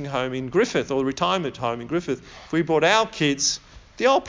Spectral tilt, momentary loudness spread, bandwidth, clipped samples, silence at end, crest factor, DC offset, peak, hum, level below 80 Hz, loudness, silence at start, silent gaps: -3.5 dB/octave; 9 LU; 7.6 kHz; under 0.1%; 0 s; 18 dB; under 0.1%; -4 dBFS; none; -54 dBFS; -23 LUFS; 0 s; none